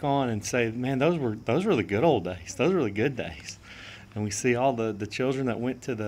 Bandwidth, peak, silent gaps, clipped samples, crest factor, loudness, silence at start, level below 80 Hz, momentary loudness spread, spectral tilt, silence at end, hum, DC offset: 16 kHz; -10 dBFS; none; under 0.1%; 18 dB; -27 LUFS; 0 s; -56 dBFS; 13 LU; -5.5 dB/octave; 0 s; none; under 0.1%